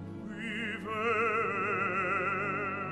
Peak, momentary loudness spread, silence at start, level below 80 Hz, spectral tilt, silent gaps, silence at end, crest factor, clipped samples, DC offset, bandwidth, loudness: -18 dBFS; 8 LU; 0 s; -66 dBFS; -6 dB/octave; none; 0 s; 14 dB; under 0.1%; under 0.1%; 12 kHz; -31 LUFS